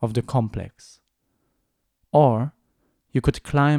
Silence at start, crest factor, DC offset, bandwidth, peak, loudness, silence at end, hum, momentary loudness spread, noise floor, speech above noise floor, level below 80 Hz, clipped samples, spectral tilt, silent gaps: 0 s; 18 dB; under 0.1%; 11.5 kHz; -4 dBFS; -22 LUFS; 0 s; none; 14 LU; -74 dBFS; 53 dB; -44 dBFS; under 0.1%; -8 dB/octave; none